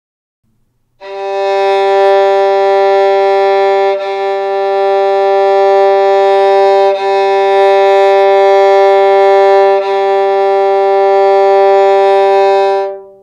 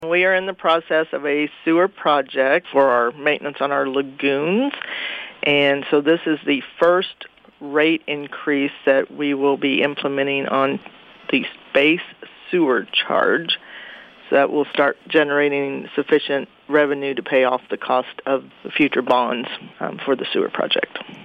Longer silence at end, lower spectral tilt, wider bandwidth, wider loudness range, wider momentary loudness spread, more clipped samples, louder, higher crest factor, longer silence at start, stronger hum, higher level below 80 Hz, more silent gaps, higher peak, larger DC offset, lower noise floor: first, 0.15 s vs 0 s; second, -3.5 dB/octave vs -6.5 dB/octave; first, 7.4 kHz vs 5.8 kHz; about the same, 2 LU vs 2 LU; second, 6 LU vs 9 LU; neither; first, -9 LUFS vs -19 LUFS; second, 8 dB vs 16 dB; first, 1 s vs 0 s; neither; about the same, -64 dBFS vs -68 dBFS; neither; first, 0 dBFS vs -4 dBFS; neither; first, -57 dBFS vs -40 dBFS